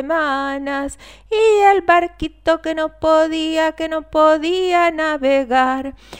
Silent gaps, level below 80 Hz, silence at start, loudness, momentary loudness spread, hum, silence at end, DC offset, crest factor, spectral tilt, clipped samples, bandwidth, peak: none; -44 dBFS; 0 s; -17 LUFS; 10 LU; none; 0 s; 0.2%; 16 dB; -4 dB/octave; under 0.1%; 16 kHz; -2 dBFS